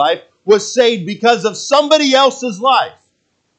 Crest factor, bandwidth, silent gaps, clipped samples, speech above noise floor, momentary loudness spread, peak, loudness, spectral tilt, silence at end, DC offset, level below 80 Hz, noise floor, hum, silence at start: 14 dB; 9 kHz; none; under 0.1%; 52 dB; 6 LU; 0 dBFS; -13 LUFS; -3 dB/octave; 0.7 s; under 0.1%; -68 dBFS; -65 dBFS; none; 0 s